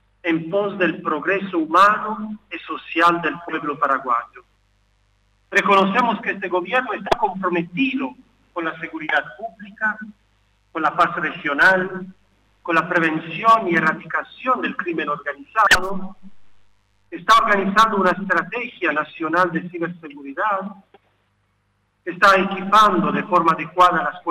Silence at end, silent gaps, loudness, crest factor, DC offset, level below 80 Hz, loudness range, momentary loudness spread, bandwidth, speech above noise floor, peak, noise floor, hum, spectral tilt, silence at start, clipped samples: 0 s; none; -19 LUFS; 14 dB; under 0.1%; -54 dBFS; 5 LU; 16 LU; 16 kHz; 47 dB; -6 dBFS; -66 dBFS; 50 Hz at -55 dBFS; -4.5 dB/octave; 0.25 s; under 0.1%